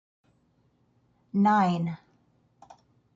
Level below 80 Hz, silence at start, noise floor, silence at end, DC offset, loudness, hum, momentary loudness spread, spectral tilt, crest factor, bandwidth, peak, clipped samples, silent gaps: -72 dBFS; 1.35 s; -68 dBFS; 1.2 s; under 0.1%; -25 LUFS; none; 13 LU; -8 dB/octave; 18 dB; 7.6 kHz; -12 dBFS; under 0.1%; none